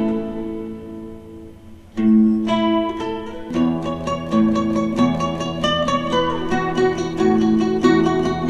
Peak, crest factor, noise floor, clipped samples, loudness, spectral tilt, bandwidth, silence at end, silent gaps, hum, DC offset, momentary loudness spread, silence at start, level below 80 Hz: -2 dBFS; 16 dB; -40 dBFS; under 0.1%; -19 LUFS; -6.5 dB/octave; 9 kHz; 0 s; none; none; under 0.1%; 16 LU; 0 s; -42 dBFS